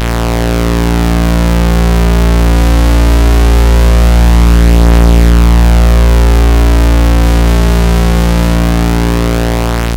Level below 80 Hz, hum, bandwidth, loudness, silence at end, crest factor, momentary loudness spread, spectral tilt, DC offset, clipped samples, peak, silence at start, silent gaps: -8 dBFS; none; 16.5 kHz; -9 LUFS; 0 s; 6 dB; 4 LU; -6 dB/octave; under 0.1%; under 0.1%; 0 dBFS; 0 s; none